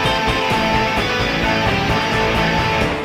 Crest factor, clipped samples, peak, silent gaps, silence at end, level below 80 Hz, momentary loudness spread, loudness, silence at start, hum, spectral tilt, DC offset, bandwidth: 14 dB; under 0.1%; -4 dBFS; none; 0 s; -30 dBFS; 1 LU; -17 LUFS; 0 s; none; -4.5 dB/octave; under 0.1%; 16 kHz